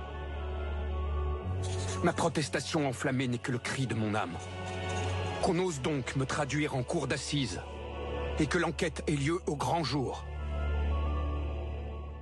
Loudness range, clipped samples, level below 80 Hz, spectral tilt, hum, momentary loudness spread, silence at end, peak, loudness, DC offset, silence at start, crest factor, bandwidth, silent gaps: 1 LU; under 0.1%; -40 dBFS; -5.5 dB/octave; none; 8 LU; 0 s; -16 dBFS; -33 LUFS; under 0.1%; 0 s; 16 dB; 11.5 kHz; none